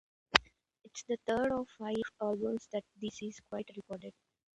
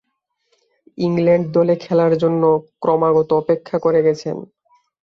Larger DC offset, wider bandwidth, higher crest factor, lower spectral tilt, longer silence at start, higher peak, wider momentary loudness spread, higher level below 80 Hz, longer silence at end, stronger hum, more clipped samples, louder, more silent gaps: neither; first, 11 kHz vs 6.8 kHz; first, 36 dB vs 14 dB; second, -3.5 dB/octave vs -8.5 dB/octave; second, 0.3 s vs 1 s; about the same, -2 dBFS vs -4 dBFS; first, 17 LU vs 7 LU; second, -64 dBFS vs -58 dBFS; second, 0.45 s vs 0.6 s; neither; neither; second, -36 LUFS vs -17 LUFS; neither